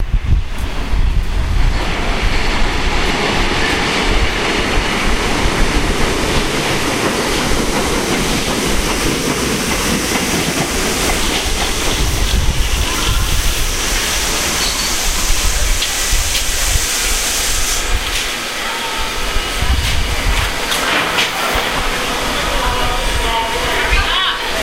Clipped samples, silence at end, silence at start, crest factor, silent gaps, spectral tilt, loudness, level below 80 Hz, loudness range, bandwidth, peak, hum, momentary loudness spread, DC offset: under 0.1%; 0 s; 0 s; 16 dB; none; -2.5 dB/octave; -16 LUFS; -20 dBFS; 2 LU; 16 kHz; 0 dBFS; none; 4 LU; under 0.1%